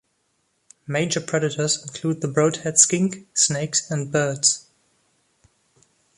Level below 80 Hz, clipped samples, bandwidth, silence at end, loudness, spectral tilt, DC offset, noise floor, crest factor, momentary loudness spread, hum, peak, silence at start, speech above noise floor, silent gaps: -64 dBFS; under 0.1%; 11.5 kHz; 1.55 s; -21 LUFS; -3 dB/octave; under 0.1%; -70 dBFS; 24 dB; 10 LU; none; 0 dBFS; 0.9 s; 48 dB; none